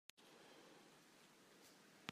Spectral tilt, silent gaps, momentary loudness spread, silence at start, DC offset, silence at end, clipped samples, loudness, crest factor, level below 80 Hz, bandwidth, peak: -3 dB/octave; none; 4 LU; 0.15 s; under 0.1%; 0 s; under 0.1%; -64 LUFS; 36 dB; under -90 dBFS; 15.5 kHz; -26 dBFS